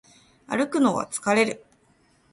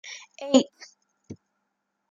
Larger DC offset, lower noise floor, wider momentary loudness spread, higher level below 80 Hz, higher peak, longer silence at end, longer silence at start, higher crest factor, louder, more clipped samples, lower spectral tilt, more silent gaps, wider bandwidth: neither; second, -62 dBFS vs -79 dBFS; second, 8 LU vs 25 LU; first, -66 dBFS vs -76 dBFS; about the same, -8 dBFS vs -6 dBFS; about the same, 0.75 s vs 0.8 s; first, 0.5 s vs 0.05 s; second, 18 dB vs 24 dB; about the same, -24 LUFS vs -23 LUFS; neither; about the same, -4 dB/octave vs -3.5 dB/octave; neither; first, 11.5 kHz vs 8.8 kHz